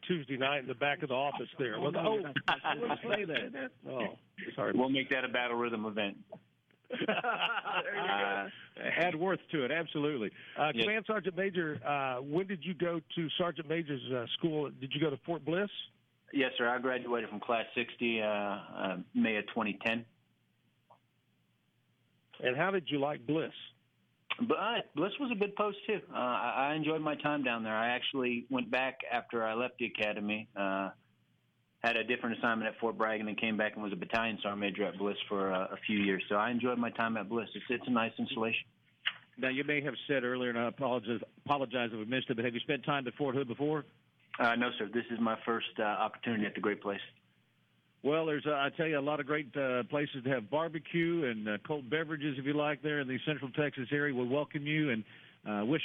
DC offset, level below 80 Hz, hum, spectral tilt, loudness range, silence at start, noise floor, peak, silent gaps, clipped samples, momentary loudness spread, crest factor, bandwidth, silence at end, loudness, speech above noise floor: under 0.1%; -78 dBFS; none; -7.5 dB/octave; 2 LU; 0 s; -74 dBFS; -16 dBFS; none; under 0.1%; 6 LU; 18 dB; 7.2 kHz; 0 s; -34 LUFS; 40 dB